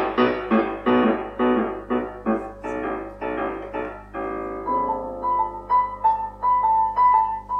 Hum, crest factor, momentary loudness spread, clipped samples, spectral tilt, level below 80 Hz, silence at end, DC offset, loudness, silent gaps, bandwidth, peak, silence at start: 50 Hz at -45 dBFS; 16 dB; 11 LU; under 0.1%; -7.5 dB/octave; -46 dBFS; 0 s; under 0.1%; -23 LUFS; none; 6.4 kHz; -6 dBFS; 0 s